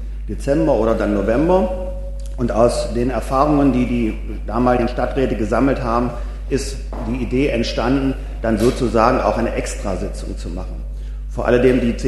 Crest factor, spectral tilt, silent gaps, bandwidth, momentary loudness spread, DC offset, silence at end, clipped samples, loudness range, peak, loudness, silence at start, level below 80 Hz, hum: 18 dB; -6.5 dB/octave; none; 12.5 kHz; 13 LU; under 0.1%; 0 s; under 0.1%; 2 LU; 0 dBFS; -19 LUFS; 0 s; -26 dBFS; none